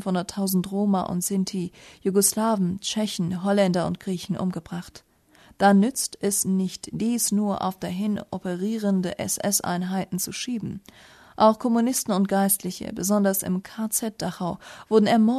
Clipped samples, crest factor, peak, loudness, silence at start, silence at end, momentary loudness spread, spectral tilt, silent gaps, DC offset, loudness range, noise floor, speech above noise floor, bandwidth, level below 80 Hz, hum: under 0.1%; 18 dB; -6 dBFS; -24 LUFS; 0 s; 0 s; 11 LU; -4.5 dB/octave; none; under 0.1%; 3 LU; -55 dBFS; 31 dB; 13.5 kHz; -60 dBFS; none